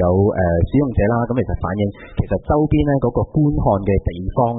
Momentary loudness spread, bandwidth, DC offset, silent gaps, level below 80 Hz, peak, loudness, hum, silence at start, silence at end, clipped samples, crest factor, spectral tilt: 6 LU; 4 kHz; under 0.1%; none; -30 dBFS; -4 dBFS; -18 LUFS; none; 0 s; 0 s; under 0.1%; 12 dB; -14 dB/octave